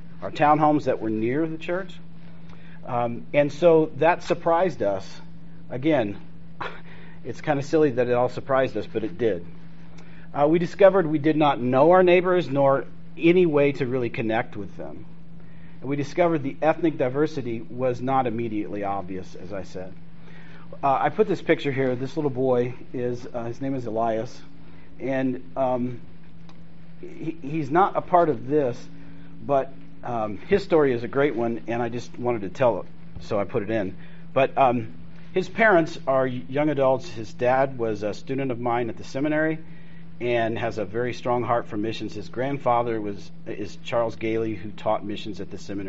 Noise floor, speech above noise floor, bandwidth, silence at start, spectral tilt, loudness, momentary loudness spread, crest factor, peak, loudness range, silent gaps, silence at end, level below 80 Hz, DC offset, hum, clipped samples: -47 dBFS; 23 dB; 7.6 kHz; 0.05 s; -5.5 dB/octave; -24 LUFS; 17 LU; 20 dB; -4 dBFS; 7 LU; none; 0 s; -56 dBFS; 2%; none; under 0.1%